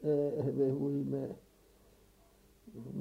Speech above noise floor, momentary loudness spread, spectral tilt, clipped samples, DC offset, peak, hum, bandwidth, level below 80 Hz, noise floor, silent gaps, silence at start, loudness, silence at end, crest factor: 30 dB; 19 LU; -10 dB/octave; under 0.1%; under 0.1%; -20 dBFS; none; 15.5 kHz; -68 dBFS; -64 dBFS; none; 0 s; -35 LUFS; 0 s; 16 dB